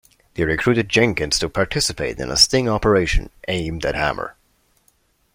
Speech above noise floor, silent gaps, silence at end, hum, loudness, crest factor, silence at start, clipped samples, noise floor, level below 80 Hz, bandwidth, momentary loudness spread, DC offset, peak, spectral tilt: 42 dB; none; 1.05 s; none; -19 LUFS; 20 dB; 0.35 s; under 0.1%; -62 dBFS; -32 dBFS; 16.5 kHz; 11 LU; under 0.1%; 0 dBFS; -3.5 dB/octave